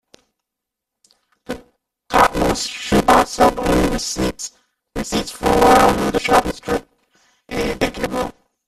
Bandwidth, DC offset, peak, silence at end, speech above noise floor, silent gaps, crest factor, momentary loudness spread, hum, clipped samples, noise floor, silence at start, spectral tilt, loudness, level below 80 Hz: 15 kHz; under 0.1%; 0 dBFS; 0.35 s; 66 dB; none; 18 dB; 17 LU; none; under 0.1%; -83 dBFS; 1.5 s; -4 dB/octave; -17 LUFS; -34 dBFS